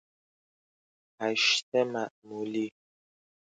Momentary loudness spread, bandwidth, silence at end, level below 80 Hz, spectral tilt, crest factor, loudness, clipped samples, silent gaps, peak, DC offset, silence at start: 14 LU; 9.4 kHz; 0.85 s; -84 dBFS; -2.5 dB/octave; 22 dB; -29 LUFS; under 0.1%; 1.62-1.72 s, 2.11-2.22 s; -12 dBFS; under 0.1%; 1.2 s